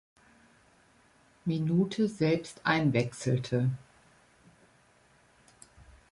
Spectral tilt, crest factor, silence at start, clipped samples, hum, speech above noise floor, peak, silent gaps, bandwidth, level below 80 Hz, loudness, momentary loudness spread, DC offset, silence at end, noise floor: -6.5 dB/octave; 20 dB; 1.45 s; under 0.1%; none; 35 dB; -12 dBFS; none; 11.5 kHz; -64 dBFS; -30 LUFS; 7 LU; under 0.1%; 0.3 s; -64 dBFS